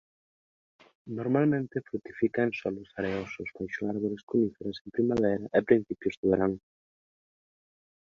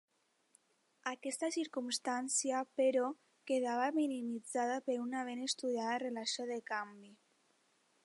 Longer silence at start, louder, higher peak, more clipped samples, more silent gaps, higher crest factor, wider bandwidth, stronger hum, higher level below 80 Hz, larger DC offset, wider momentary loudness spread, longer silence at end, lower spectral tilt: about the same, 1.05 s vs 1.05 s; first, -30 LUFS vs -37 LUFS; first, -8 dBFS vs -22 dBFS; neither; first, 4.23-4.27 s, 4.81-4.85 s, 6.17-6.23 s vs none; first, 22 dB vs 16 dB; second, 7.2 kHz vs 11.5 kHz; neither; first, -62 dBFS vs under -90 dBFS; neither; first, 11 LU vs 8 LU; first, 1.4 s vs 0.9 s; first, -8.5 dB/octave vs -1.5 dB/octave